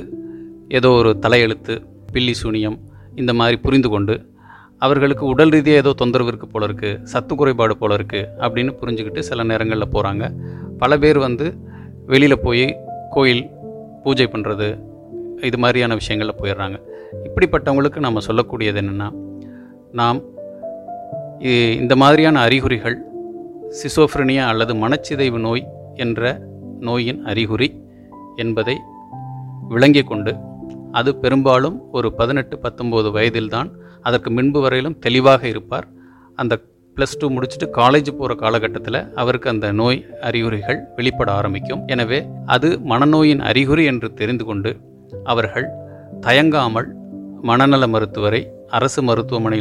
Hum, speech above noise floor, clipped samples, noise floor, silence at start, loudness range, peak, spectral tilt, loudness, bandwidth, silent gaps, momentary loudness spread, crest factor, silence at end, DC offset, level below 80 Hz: none; 27 dB; under 0.1%; -44 dBFS; 0 s; 4 LU; 0 dBFS; -6.5 dB/octave; -17 LUFS; 12 kHz; none; 19 LU; 18 dB; 0 s; under 0.1%; -40 dBFS